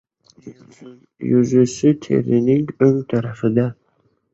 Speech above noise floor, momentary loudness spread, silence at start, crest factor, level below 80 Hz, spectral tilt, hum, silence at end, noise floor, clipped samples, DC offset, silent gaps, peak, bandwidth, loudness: 46 dB; 6 LU; 0.45 s; 16 dB; -56 dBFS; -8 dB/octave; none; 0.6 s; -63 dBFS; under 0.1%; under 0.1%; none; -2 dBFS; 8.2 kHz; -18 LUFS